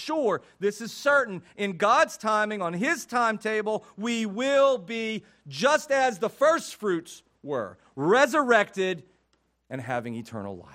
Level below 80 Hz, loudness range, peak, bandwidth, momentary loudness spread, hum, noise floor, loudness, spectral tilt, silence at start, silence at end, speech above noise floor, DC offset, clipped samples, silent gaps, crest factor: -74 dBFS; 2 LU; -8 dBFS; 16 kHz; 15 LU; none; -71 dBFS; -25 LUFS; -4 dB/octave; 0 s; 0.15 s; 45 dB; under 0.1%; under 0.1%; none; 18 dB